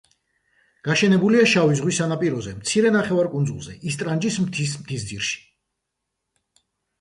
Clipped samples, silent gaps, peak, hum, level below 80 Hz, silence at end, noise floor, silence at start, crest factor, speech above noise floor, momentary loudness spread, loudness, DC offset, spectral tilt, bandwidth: under 0.1%; none; -6 dBFS; none; -56 dBFS; 1.6 s; -80 dBFS; 0.85 s; 16 dB; 59 dB; 13 LU; -21 LUFS; under 0.1%; -5 dB/octave; 11.5 kHz